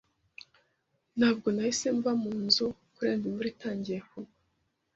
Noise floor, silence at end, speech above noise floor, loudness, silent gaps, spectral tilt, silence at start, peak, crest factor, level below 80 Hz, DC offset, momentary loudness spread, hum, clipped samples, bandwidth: -77 dBFS; 0.7 s; 47 dB; -30 LUFS; none; -4 dB/octave; 1.15 s; -10 dBFS; 22 dB; -68 dBFS; under 0.1%; 22 LU; none; under 0.1%; 8 kHz